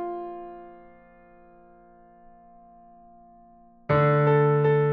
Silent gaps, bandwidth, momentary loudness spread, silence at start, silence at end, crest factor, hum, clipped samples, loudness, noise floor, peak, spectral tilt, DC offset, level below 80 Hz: none; 4.7 kHz; 23 LU; 0 s; 0 s; 16 dB; none; under 0.1%; -22 LUFS; -53 dBFS; -10 dBFS; -7.5 dB/octave; under 0.1%; -58 dBFS